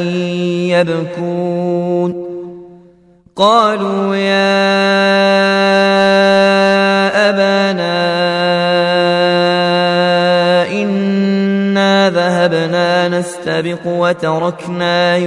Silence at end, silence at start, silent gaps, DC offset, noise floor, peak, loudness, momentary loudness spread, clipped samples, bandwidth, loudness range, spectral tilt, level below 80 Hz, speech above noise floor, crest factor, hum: 0 s; 0 s; none; under 0.1%; -47 dBFS; 0 dBFS; -12 LUFS; 8 LU; under 0.1%; 11.5 kHz; 5 LU; -5.5 dB/octave; -60 dBFS; 34 dB; 12 dB; none